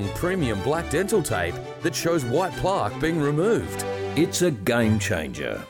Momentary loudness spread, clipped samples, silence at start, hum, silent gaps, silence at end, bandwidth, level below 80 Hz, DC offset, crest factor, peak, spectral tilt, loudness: 6 LU; under 0.1%; 0 s; none; none; 0 s; 17 kHz; -46 dBFS; under 0.1%; 14 dB; -10 dBFS; -5 dB/octave; -24 LUFS